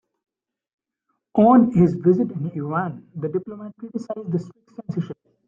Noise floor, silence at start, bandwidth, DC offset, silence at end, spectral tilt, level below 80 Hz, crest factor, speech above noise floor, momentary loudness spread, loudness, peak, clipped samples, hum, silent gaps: -76 dBFS; 1.35 s; 7.2 kHz; under 0.1%; 0.35 s; -10.5 dB/octave; -58 dBFS; 18 dB; 55 dB; 19 LU; -21 LUFS; -4 dBFS; under 0.1%; none; none